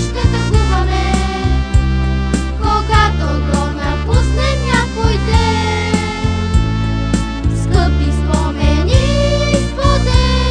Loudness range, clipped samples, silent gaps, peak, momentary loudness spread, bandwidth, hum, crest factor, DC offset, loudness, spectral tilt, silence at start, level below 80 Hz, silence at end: 1 LU; under 0.1%; none; 0 dBFS; 4 LU; 10 kHz; none; 14 dB; under 0.1%; -15 LUFS; -6 dB/octave; 0 s; -16 dBFS; 0 s